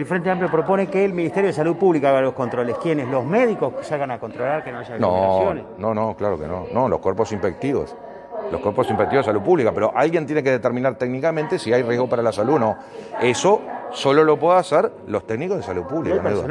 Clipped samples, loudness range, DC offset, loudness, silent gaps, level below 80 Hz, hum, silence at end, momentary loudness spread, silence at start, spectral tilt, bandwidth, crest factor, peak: under 0.1%; 3 LU; under 0.1%; -20 LUFS; none; -56 dBFS; none; 0 s; 9 LU; 0 s; -6.5 dB/octave; 11.5 kHz; 16 dB; -4 dBFS